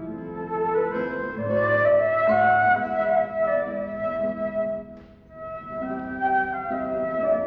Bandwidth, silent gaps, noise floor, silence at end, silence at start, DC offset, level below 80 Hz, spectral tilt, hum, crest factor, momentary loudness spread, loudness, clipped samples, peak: 5 kHz; none; -45 dBFS; 0 s; 0 s; under 0.1%; -56 dBFS; -9 dB/octave; none; 14 dB; 15 LU; -24 LUFS; under 0.1%; -10 dBFS